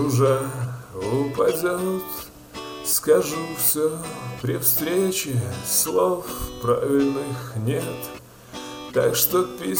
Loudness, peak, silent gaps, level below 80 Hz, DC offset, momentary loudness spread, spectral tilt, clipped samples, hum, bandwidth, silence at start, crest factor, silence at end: -22 LUFS; -2 dBFS; none; -50 dBFS; under 0.1%; 15 LU; -4.5 dB/octave; under 0.1%; none; over 20 kHz; 0 s; 20 dB; 0 s